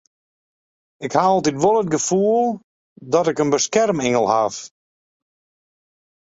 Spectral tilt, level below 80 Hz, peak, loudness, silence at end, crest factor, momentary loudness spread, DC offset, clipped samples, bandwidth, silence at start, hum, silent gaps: -4.5 dB/octave; -60 dBFS; -2 dBFS; -18 LUFS; 1.55 s; 20 dB; 7 LU; under 0.1%; under 0.1%; 8 kHz; 1 s; none; 2.64-2.96 s